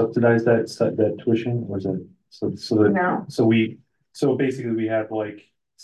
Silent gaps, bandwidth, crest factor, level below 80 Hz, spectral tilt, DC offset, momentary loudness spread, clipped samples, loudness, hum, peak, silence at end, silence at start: none; 12 kHz; 16 dB; -58 dBFS; -7.5 dB/octave; under 0.1%; 10 LU; under 0.1%; -22 LUFS; none; -6 dBFS; 0.45 s; 0 s